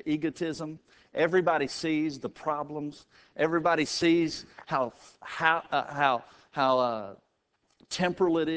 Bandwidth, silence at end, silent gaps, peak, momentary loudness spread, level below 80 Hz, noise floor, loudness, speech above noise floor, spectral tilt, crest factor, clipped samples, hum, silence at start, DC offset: 8 kHz; 0 s; none; -8 dBFS; 14 LU; -66 dBFS; -74 dBFS; -28 LUFS; 45 dB; -5 dB/octave; 22 dB; under 0.1%; none; 0.05 s; under 0.1%